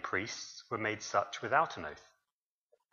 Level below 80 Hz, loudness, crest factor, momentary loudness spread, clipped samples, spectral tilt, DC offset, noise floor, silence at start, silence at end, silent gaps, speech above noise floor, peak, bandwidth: -74 dBFS; -35 LUFS; 24 dB; 13 LU; under 0.1%; -3.5 dB/octave; under 0.1%; under -90 dBFS; 0 s; 0.9 s; none; over 55 dB; -14 dBFS; 7.4 kHz